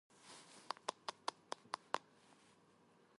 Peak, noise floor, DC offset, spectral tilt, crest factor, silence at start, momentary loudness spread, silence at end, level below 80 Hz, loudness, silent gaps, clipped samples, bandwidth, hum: -20 dBFS; -71 dBFS; under 0.1%; -1.5 dB/octave; 32 dB; 0.25 s; 22 LU; 1.2 s; under -90 dBFS; -48 LUFS; none; under 0.1%; 11.5 kHz; none